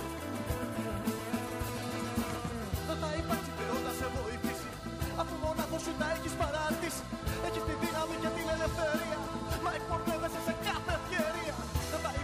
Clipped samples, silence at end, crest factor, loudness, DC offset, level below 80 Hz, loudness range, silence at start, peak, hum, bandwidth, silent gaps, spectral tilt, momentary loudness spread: under 0.1%; 0 s; 16 dB; -35 LUFS; under 0.1%; -46 dBFS; 2 LU; 0 s; -18 dBFS; none; 15.5 kHz; none; -5 dB/octave; 4 LU